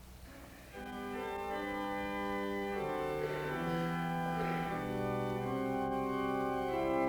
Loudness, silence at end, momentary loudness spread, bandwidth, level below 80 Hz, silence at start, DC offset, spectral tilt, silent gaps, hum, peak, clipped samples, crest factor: -37 LUFS; 0 s; 9 LU; over 20 kHz; -56 dBFS; 0 s; under 0.1%; -6.5 dB/octave; none; none; -22 dBFS; under 0.1%; 16 dB